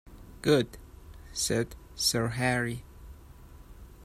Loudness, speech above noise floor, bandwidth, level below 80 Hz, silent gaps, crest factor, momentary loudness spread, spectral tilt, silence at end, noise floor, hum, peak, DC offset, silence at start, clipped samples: -29 LUFS; 22 dB; 15.5 kHz; -50 dBFS; none; 22 dB; 15 LU; -4 dB/octave; 0 s; -50 dBFS; none; -10 dBFS; under 0.1%; 0.1 s; under 0.1%